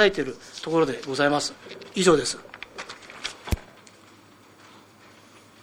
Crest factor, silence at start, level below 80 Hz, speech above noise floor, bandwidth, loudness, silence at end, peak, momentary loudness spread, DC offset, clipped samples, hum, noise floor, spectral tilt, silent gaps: 24 dB; 0 s; -44 dBFS; 29 dB; 19 kHz; -25 LUFS; 2 s; -2 dBFS; 18 LU; under 0.1%; under 0.1%; none; -52 dBFS; -4 dB/octave; none